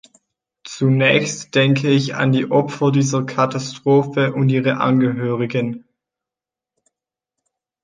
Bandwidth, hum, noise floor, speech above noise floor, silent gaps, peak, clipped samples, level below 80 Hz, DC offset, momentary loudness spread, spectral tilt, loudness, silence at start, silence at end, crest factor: 9.6 kHz; none; -88 dBFS; 71 dB; none; 0 dBFS; under 0.1%; -62 dBFS; under 0.1%; 6 LU; -6 dB/octave; -17 LUFS; 0.65 s; 2.05 s; 18 dB